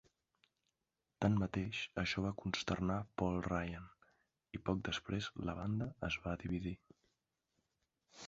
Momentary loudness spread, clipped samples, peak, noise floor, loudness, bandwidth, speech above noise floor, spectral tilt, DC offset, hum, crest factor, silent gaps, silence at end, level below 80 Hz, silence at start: 9 LU; under 0.1%; -20 dBFS; -89 dBFS; -40 LUFS; 7.6 kHz; 50 dB; -5 dB/octave; under 0.1%; none; 22 dB; none; 0 s; -58 dBFS; 1.2 s